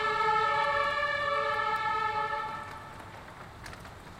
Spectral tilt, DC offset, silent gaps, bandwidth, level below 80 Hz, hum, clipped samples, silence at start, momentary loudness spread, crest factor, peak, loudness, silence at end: -3.5 dB/octave; under 0.1%; none; 16 kHz; -58 dBFS; none; under 0.1%; 0 s; 19 LU; 16 dB; -16 dBFS; -29 LUFS; 0 s